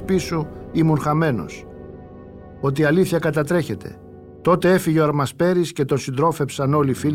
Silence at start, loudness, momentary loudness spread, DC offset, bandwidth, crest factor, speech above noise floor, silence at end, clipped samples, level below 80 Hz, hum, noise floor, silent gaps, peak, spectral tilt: 0 s; -20 LUFS; 21 LU; under 0.1%; 16 kHz; 16 dB; 20 dB; 0 s; under 0.1%; -48 dBFS; none; -39 dBFS; none; -4 dBFS; -6.5 dB/octave